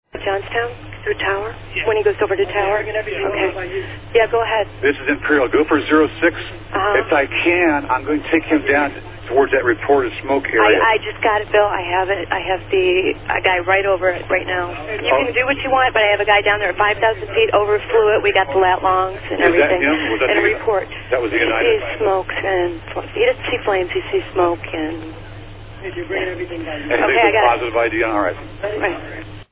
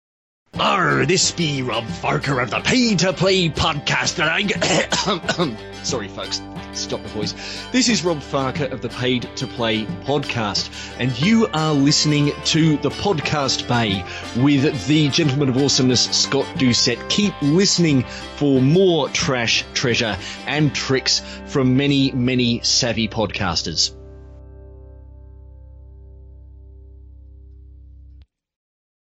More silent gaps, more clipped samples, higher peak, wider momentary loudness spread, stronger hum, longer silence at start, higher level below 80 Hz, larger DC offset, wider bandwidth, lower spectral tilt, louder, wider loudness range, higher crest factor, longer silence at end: neither; neither; first, 0 dBFS vs -6 dBFS; about the same, 10 LU vs 9 LU; neither; second, 0.15 s vs 0.55 s; about the same, -40 dBFS vs -44 dBFS; neither; second, 4 kHz vs 11 kHz; first, -8.5 dB/octave vs -4 dB/octave; about the same, -17 LUFS vs -19 LUFS; about the same, 4 LU vs 6 LU; about the same, 18 dB vs 14 dB; second, 0.1 s vs 0.85 s